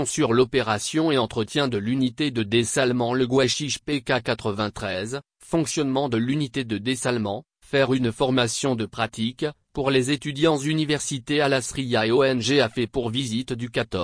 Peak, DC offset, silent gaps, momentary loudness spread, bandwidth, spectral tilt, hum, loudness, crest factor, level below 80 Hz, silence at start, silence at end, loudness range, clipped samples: -8 dBFS; under 0.1%; none; 7 LU; 10.5 kHz; -4.5 dB/octave; none; -23 LUFS; 16 dB; -52 dBFS; 0 s; 0 s; 3 LU; under 0.1%